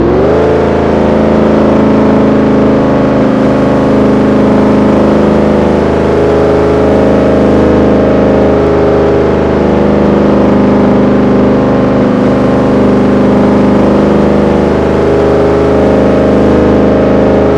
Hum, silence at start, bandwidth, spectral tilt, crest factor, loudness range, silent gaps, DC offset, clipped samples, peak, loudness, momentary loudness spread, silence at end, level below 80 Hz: none; 0 s; 9.4 kHz; -8.5 dB/octave; 6 dB; 0 LU; none; under 0.1%; 2%; 0 dBFS; -7 LUFS; 1 LU; 0 s; -22 dBFS